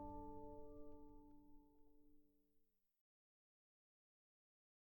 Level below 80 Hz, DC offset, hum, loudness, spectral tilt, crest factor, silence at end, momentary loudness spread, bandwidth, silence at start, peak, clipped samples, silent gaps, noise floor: -68 dBFS; under 0.1%; none; -60 LUFS; -9 dB/octave; 18 dB; 2.2 s; 11 LU; 17.5 kHz; 0 s; -42 dBFS; under 0.1%; none; -81 dBFS